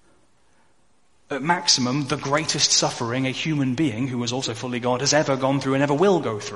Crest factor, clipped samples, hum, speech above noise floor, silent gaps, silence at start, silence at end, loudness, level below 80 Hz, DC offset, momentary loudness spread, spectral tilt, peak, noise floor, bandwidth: 20 dB; under 0.1%; none; 43 dB; none; 1.3 s; 0 s; -21 LUFS; -58 dBFS; 0.2%; 8 LU; -3.5 dB/octave; -4 dBFS; -65 dBFS; 11.5 kHz